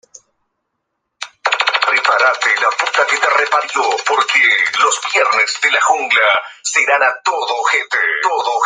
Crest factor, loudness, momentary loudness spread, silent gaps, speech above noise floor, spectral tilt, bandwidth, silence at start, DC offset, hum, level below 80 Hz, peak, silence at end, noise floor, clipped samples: 16 dB; -13 LUFS; 5 LU; none; 58 dB; 2 dB/octave; 9.8 kHz; 1.2 s; under 0.1%; none; -72 dBFS; 0 dBFS; 0 s; -73 dBFS; under 0.1%